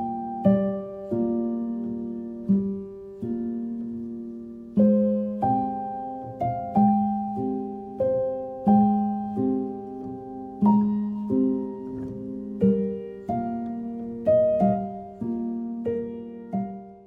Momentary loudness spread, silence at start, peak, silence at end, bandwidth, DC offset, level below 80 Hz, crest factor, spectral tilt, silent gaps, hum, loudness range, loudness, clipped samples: 14 LU; 0 s; -8 dBFS; 0 s; 3.2 kHz; under 0.1%; -56 dBFS; 18 dB; -12 dB/octave; none; none; 4 LU; -26 LUFS; under 0.1%